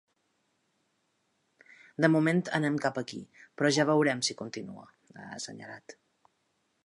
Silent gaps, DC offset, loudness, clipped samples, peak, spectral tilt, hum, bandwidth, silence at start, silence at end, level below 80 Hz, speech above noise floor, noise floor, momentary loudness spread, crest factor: none; under 0.1%; -28 LUFS; under 0.1%; -8 dBFS; -5 dB/octave; none; 11.5 kHz; 2 s; 0.95 s; -78 dBFS; 46 dB; -76 dBFS; 21 LU; 24 dB